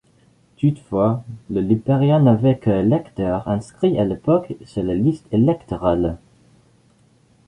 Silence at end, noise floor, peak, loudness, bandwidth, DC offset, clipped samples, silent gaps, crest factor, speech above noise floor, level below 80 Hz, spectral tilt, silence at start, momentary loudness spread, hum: 1.3 s; -56 dBFS; -2 dBFS; -19 LUFS; 10 kHz; under 0.1%; under 0.1%; none; 18 dB; 38 dB; -44 dBFS; -9.5 dB/octave; 0.6 s; 10 LU; none